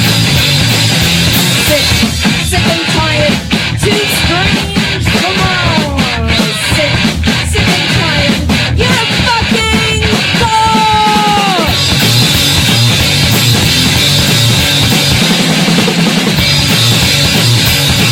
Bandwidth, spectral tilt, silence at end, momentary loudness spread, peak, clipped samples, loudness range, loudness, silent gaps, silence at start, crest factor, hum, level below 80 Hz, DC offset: 17.5 kHz; -3.5 dB/octave; 0 s; 3 LU; 0 dBFS; under 0.1%; 3 LU; -8 LUFS; none; 0 s; 10 dB; none; -24 dBFS; 0.2%